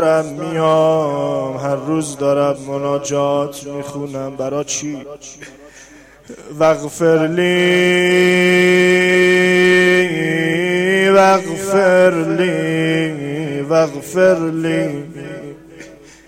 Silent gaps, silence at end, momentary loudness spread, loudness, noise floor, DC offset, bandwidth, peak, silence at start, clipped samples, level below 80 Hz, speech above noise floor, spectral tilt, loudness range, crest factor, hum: none; 0.35 s; 15 LU; -15 LUFS; -42 dBFS; under 0.1%; 15.5 kHz; 0 dBFS; 0 s; under 0.1%; -54 dBFS; 27 dB; -5 dB/octave; 10 LU; 14 dB; none